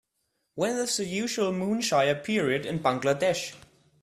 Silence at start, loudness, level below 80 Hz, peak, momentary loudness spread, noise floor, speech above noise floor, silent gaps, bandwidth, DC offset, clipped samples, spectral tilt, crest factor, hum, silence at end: 0.55 s; -27 LUFS; -66 dBFS; -10 dBFS; 6 LU; -77 dBFS; 51 dB; none; 14 kHz; under 0.1%; under 0.1%; -4 dB/octave; 18 dB; none; 0.45 s